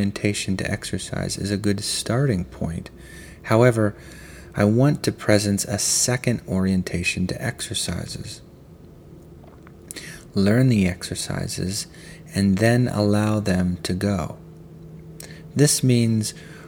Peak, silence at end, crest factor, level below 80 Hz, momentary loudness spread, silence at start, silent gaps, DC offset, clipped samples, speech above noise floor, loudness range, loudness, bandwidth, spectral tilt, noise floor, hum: -2 dBFS; 0 s; 22 dB; -48 dBFS; 21 LU; 0 s; none; under 0.1%; under 0.1%; 24 dB; 5 LU; -22 LUFS; 18.5 kHz; -5 dB/octave; -45 dBFS; none